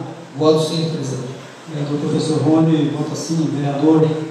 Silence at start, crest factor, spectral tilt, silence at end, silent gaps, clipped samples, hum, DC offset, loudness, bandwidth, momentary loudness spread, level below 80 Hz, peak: 0 s; 16 dB; -6.5 dB/octave; 0 s; none; under 0.1%; none; under 0.1%; -18 LUFS; 12 kHz; 14 LU; -64 dBFS; -2 dBFS